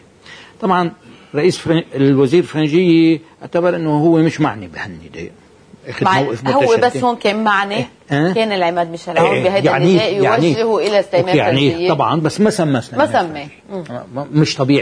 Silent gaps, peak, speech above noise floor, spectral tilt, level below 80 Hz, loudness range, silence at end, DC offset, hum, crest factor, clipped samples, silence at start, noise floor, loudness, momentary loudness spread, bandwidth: none; -2 dBFS; 25 dB; -6 dB/octave; -54 dBFS; 3 LU; 0 s; under 0.1%; none; 14 dB; under 0.1%; 0.3 s; -40 dBFS; -15 LUFS; 14 LU; 11 kHz